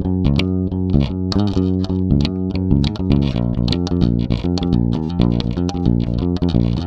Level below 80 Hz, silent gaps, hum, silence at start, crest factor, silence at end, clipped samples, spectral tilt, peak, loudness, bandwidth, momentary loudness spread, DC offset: -26 dBFS; none; none; 0 s; 16 dB; 0 s; under 0.1%; -8 dB/octave; 0 dBFS; -18 LUFS; 7.6 kHz; 3 LU; under 0.1%